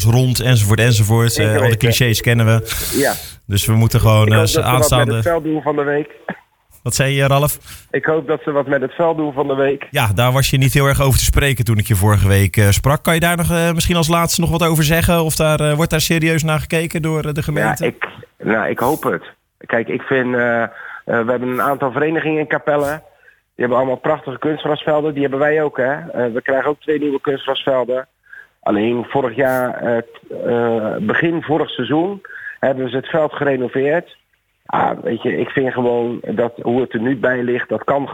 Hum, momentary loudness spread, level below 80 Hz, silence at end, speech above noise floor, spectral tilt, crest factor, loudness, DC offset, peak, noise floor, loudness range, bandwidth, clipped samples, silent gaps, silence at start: none; 7 LU; -34 dBFS; 0 s; 36 dB; -5 dB/octave; 14 dB; -16 LUFS; under 0.1%; -2 dBFS; -51 dBFS; 5 LU; 19.5 kHz; under 0.1%; none; 0 s